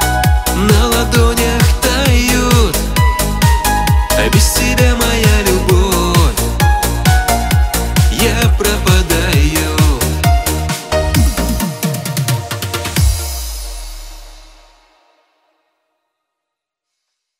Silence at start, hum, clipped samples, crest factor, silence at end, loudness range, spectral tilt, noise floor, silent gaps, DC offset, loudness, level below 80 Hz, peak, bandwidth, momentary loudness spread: 0 s; none; under 0.1%; 12 dB; 2.95 s; 8 LU; -4.5 dB/octave; -79 dBFS; none; under 0.1%; -13 LUFS; -18 dBFS; 0 dBFS; 16.5 kHz; 7 LU